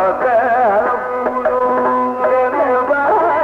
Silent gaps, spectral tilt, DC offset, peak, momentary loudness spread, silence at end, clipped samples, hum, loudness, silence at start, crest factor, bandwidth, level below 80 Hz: none; -7 dB/octave; under 0.1%; -4 dBFS; 4 LU; 0 s; under 0.1%; none; -15 LUFS; 0 s; 10 dB; 6.4 kHz; -52 dBFS